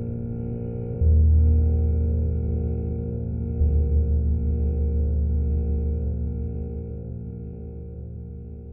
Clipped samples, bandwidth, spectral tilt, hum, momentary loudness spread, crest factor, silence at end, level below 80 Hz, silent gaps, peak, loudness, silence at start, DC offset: under 0.1%; 1.5 kHz; -16 dB/octave; none; 17 LU; 12 dB; 0 s; -24 dBFS; none; -10 dBFS; -25 LUFS; 0 s; under 0.1%